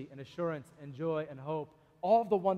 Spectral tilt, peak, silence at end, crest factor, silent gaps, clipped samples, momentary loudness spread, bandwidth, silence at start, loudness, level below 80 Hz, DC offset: -8.5 dB/octave; -16 dBFS; 0 s; 18 dB; none; under 0.1%; 17 LU; 9 kHz; 0 s; -34 LUFS; -72 dBFS; under 0.1%